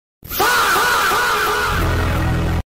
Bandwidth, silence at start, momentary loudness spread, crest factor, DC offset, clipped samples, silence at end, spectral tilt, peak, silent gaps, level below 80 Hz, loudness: 16.5 kHz; 0.25 s; 5 LU; 10 dB; under 0.1%; under 0.1%; 0.05 s; -3.5 dB/octave; -8 dBFS; none; -28 dBFS; -16 LUFS